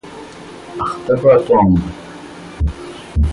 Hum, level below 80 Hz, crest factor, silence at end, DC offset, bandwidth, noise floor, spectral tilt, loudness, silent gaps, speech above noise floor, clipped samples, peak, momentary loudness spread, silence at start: none; -26 dBFS; 16 dB; 0 s; under 0.1%; 11.5 kHz; -34 dBFS; -8.5 dB/octave; -15 LUFS; none; 21 dB; under 0.1%; 0 dBFS; 22 LU; 0.05 s